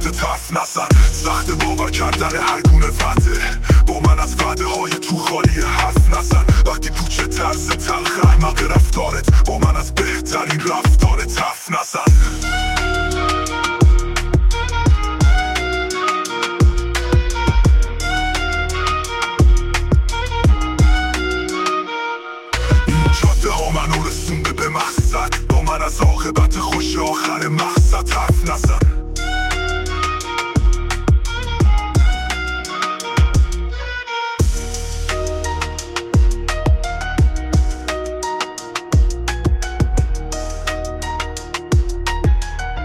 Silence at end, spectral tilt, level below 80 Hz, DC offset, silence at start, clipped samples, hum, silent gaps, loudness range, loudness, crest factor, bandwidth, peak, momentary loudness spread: 0 s; -5 dB/octave; -18 dBFS; under 0.1%; 0 s; under 0.1%; none; none; 4 LU; -18 LUFS; 14 dB; 16 kHz; -2 dBFS; 8 LU